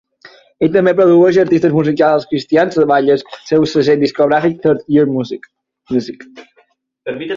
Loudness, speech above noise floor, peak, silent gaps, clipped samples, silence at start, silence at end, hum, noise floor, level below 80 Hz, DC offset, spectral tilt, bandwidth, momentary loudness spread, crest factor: -13 LUFS; 43 dB; 0 dBFS; none; under 0.1%; 0.25 s; 0 s; none; -56 dBFS; -54 dBFS; under 0.1%; -7 dB/octave; 7.4 kHz; 15 LU; 12 dB